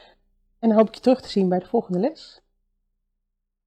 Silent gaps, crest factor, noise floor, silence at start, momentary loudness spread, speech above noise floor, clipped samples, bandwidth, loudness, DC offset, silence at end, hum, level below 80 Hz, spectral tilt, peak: none; 18 dB; -78 dBFS; 0.6 s; 6 LU; 57 dB; under 0.1%; 9.2 kHz; -22 LUFS; under 0.1%; 1.55 s; none; -62 dBFS; -8 dB/octave; -6 dBFS